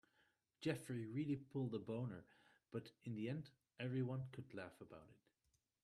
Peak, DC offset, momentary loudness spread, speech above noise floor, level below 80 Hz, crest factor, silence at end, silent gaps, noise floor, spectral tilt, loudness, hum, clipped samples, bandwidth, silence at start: -28 dBFS; under 0.1%; 13 LU; 39 dB; -82 dBFS; 20 dB; 0.7 s; none; -86 dBFS; -7.5 dB/octave; -48 LUFS; none; under 0.1%; 13.5 kHz; 0.6 s